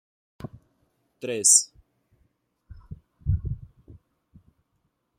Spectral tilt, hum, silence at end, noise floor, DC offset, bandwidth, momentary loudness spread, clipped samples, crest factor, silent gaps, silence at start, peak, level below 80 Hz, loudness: -2.5 dB/octave; none; 1.25 s; -74 dBFS; under 0.1%; 15 kHz; 27 LU; under 0.1%; 28 dB; none; 0.4 s; -2 dBFS; -44 dBFS; -21 LUFS